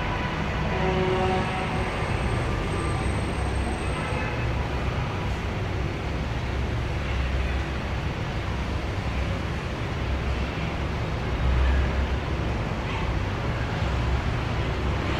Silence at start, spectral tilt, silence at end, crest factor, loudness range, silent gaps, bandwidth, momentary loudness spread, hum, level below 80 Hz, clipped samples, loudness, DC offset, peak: 0 s; -6.5 dB/octave; 0 s; 16 dB; 3 LU; none; 9.8 kHz; 5 LU; none; -30 dBFS; under 0.1%; -27 LUFS; under 0.1%; -10 dBFS